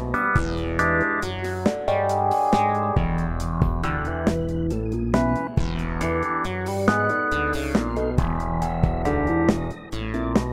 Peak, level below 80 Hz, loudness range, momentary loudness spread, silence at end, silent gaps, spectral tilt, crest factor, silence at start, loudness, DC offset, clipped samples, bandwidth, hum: -2 dBFS; -32 dBFS; 2 LU; 6 LU; 0 s; none; -7 dB/octave; 20 dB; 0 s; -23 LUFS; under 0.1%; under 0.1%; 16 kHz; none